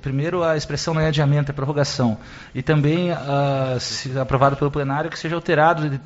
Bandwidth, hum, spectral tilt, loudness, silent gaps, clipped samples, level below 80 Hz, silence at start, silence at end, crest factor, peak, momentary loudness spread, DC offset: 8 kHz; none; -5.5 dB/octave; -20 LUFS; none; under 0.1%; -44 dBFS; 0.05 s; 0 s; 16 dB; -4 dBFS; 7 LU; under 0.1%